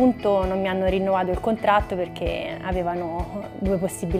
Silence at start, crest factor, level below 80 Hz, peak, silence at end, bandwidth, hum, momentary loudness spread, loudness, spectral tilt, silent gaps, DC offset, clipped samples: 0 s; 16 dB; -36 dBFS; -6 dBFS; 0 s; 15.5 kHz; none; 8 LU; -24 LUFS; -6.5 dB/octave; none; under 0.1%; under 0.1%